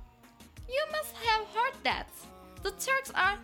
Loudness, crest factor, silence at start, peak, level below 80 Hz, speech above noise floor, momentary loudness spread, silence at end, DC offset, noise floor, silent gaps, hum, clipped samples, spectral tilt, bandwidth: -31 LUFS; 20 dB; 0 s; -12 dBFS; -54 dBFS; 25 dB; 18 LU; 0 s; under 0.1%; -56 dBFS; none; none; under 0.1%; -1.5 dB/octave; 18 kHz